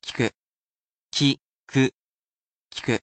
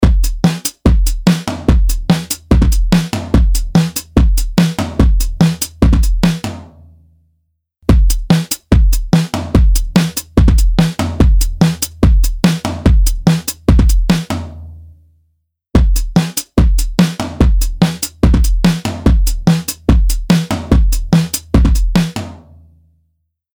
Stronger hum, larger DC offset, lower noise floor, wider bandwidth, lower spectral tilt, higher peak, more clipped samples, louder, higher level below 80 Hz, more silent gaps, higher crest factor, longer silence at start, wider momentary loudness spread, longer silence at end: neither; neither; first, under -90 dBFS vs -65 dBFS; second, 9 kHz vs over 20 kHz; about the same, -5 dB/octave vs -6 dB/octave; second, -8 dBFS vs 0 dBFS; neither; second, -25 LUFS vs -14 LUFS; second, -62 dBFS vs -14 dBFS; first, 0.34-1.09 s, 1.41-1.67 s, 1.94-2.70 s vs none; first, 18 dB vs 12 dB; about the same, 0.05 s vs 0 s; first, 10 LU vs 3 LU; second, 0.05 s vs 1.2 s